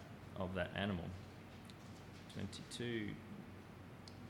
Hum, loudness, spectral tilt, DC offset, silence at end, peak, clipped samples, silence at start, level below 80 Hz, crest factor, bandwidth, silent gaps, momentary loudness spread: none; -47 LUFS; -5.5 dB/octave; under 0.1%; 0 s; -26 dBFS; under 0.1%; 0 s; -68 dBFS; 20 dB; 18.5 kHz; none; 14 LU